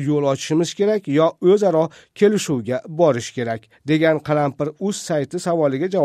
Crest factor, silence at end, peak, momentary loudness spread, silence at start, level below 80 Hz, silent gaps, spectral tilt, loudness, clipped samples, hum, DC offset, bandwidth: 16 dB; 0 s; -2 dBFS; 9 LU; 0 s; -62 dBFS; none; -6 dB/octave; -19 LUFS; under 0.1%; none; under 0.1%; 15 kHz